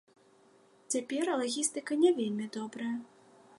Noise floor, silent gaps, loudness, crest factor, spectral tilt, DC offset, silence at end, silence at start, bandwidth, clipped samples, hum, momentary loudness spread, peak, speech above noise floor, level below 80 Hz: -63 dBFS; none; -32 LUFS; 18 dB; -3.5 dB/octave; under 0.1%; 0.55 s; 0.9 s; 11.5 kHz; under 0.1%; none; 10 LU; -14 dBFS; 32 dB; -86 dBFS